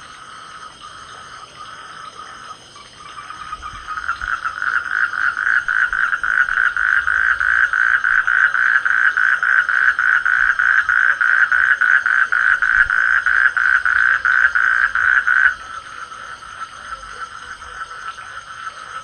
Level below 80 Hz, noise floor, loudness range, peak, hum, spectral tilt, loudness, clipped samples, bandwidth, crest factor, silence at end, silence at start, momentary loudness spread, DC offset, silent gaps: -48 dBFS; -40 dBFS; 17 LU; 0 dBFS; none; -0.5 dB/octave; -14 LUFS; under 0.1%; 9.8 kHz; 16 dB; 0 s; 0 s; 21 LU; under 0.1%; none